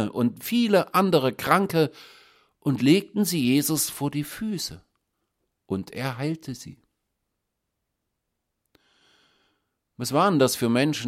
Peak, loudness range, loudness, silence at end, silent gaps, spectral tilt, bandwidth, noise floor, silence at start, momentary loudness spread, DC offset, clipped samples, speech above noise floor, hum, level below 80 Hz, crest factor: -4 dBFS; 13 LU; -24 LUFS; 0 s; none; -5 dB/octave; 16.5 kHz; -80 dBFS; 0 s; 12 LU; under 0.1%; under 0.1%; 57 dB; none; -64 dBFS; 22 dB